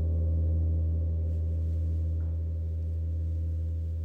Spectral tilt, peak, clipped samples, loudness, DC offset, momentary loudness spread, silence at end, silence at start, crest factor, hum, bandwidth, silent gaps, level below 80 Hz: -11.5 dB/octave; -20 dBFS; under 0.1%; -31 LUFS; under 0.1%; 5 LU; 0 s; 0 s; 8 dB; none; 1.2 kHz; none; -32 dBFS